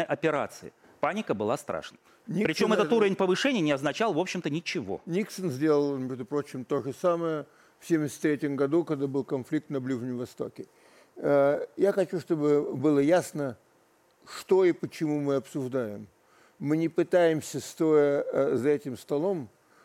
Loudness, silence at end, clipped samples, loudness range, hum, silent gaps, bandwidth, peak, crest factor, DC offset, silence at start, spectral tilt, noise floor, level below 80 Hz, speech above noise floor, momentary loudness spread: -28 LUFS; 0.35 s; under 0.1%; 3 LU; none; none; 16 kHz; -10 dBFS; 16 dB; under 0.1%; 0 s; -6 dB/octave; -64 dBFS; -72 dBFS; 37 dB; 13 LU